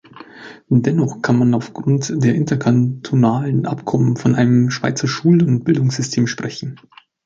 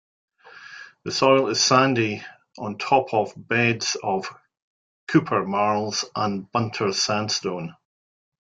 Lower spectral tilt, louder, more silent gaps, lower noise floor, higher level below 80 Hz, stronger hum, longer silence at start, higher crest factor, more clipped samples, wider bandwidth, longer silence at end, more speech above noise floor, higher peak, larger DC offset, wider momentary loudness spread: first, -6.5 dB/octave vs -4 dB/octave; first, -17 LUFS vs -22 LUFS; second, none vs 4.62-5.07 s; second, -38 dBFS vs -44 dBFS; first, -54 dBFS vs -64 dBFS; neither; second, 0.15 s vs 0.45 s; second, 14 dB vs 22 dB; neither; second, 7.8 kHz vs 9.4 kHz; second, 0.5 s vs 0.7 s; about the same, 22 dB vs 22 dB; about the same, -2 dBFS vs -2 dBFS; neither; second, 6 LU vs 18 LU